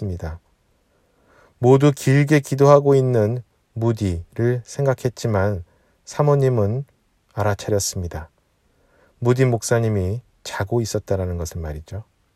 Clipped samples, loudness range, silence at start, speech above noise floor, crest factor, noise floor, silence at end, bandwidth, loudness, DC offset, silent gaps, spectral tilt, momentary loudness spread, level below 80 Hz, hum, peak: under 0.1%; 6 LU; 0 s; 44 dB; 20 dB; -63 dBFS; 0.35 s; 15 kHz; -20 LUFS; under 0.1%; none; -6.5 dB/octave; 17 LU; -44 dBFS; none; 0 dBFS